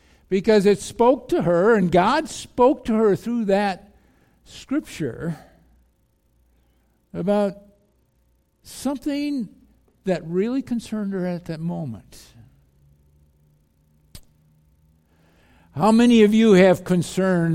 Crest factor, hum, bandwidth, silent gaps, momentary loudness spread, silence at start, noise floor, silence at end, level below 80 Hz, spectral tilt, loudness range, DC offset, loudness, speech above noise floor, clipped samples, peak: 20 dB; none; 15.5 kHz; none; 17 LU; 0.3 s; -64 dBFS; 0 s; -52 dBFS; -6.5 dB/octave; 14 LU; under 0.1%; -20 LUFS; 44 dB; under 0.1%; -2 dBFS